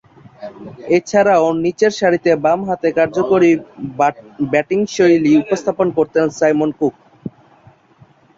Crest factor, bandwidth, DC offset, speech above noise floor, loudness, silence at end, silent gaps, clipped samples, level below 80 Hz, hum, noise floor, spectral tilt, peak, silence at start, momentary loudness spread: 14 dB; 7.8 kHz; under 0.1%; 34 dB; -15 LUFS; 1.1 s; none; under 0.1%; -56 dBFS; none; -49 dBFS; -6 dB/octave; -2 dBFS; 0.4 s; 20 LU